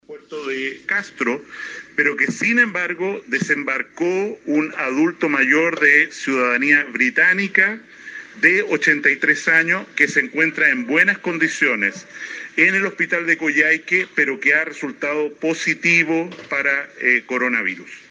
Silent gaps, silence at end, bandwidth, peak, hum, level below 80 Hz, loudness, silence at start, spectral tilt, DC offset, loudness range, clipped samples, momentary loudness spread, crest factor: none; 0.1 s; 10 kHz; -2 dBFS; none; -74 dBFS; -17 LUFS; 0.1 s; -4 dB/octave; under 0.1%; 4 LU; under 0.1%; 10 LU; 18 dB